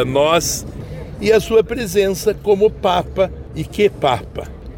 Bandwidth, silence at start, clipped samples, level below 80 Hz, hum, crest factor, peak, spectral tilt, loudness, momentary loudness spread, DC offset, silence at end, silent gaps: 17 kHz; 0 s; under 0.1%; -36 dBFS; none; 14 dB; -4 dBFS; -4.5 dB/octave; -17 LUFS; 15 LU; under 0.1%; 0 s; none